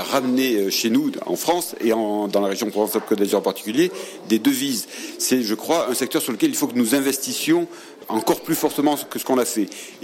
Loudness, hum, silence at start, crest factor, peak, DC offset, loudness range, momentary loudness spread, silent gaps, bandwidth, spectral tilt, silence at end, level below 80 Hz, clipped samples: -21 LUFS; none; 0 s; 16 dB; -6 dBFS; under 0.1%; 1 LU; 5 LU; none; 17.5 kHz; -3.5 dB/octave; 0 s; -72 dBFS; under 0.1%